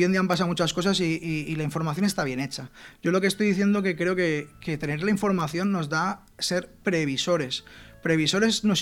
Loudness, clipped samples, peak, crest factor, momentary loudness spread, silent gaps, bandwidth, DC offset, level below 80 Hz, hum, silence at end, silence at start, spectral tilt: -25 LUFS; under 0.1%; -8 dBFS; 18 dB; 9 LU; none; 16.5 kHz; under 0.1%; -54 dBFS; none; 0 s; 0 s; -5 dB/octave